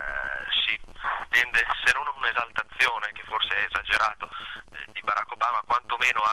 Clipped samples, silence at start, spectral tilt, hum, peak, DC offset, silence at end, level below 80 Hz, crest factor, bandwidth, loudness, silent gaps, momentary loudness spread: under 0.1%; 0 s; -0.5 dB/octave; none; -6 dBFS; 0.2%; 0 s; -50 dBFS; 20 dB; 13.5 kHz; -25 LUFS; none; 10 LU